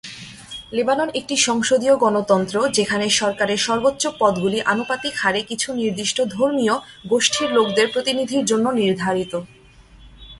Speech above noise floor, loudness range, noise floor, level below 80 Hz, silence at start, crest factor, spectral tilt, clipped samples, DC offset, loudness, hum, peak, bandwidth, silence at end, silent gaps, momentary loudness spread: 28 dB; 2 LU; -47 dBFS; -54 dBFS; 0.05 s; 18 dB; -3 dB/octave; under 0.1%; under 0.1%; -19 LUFS; none; -2 dBFS; 11.5 kHz; 0 s; none; 7 LU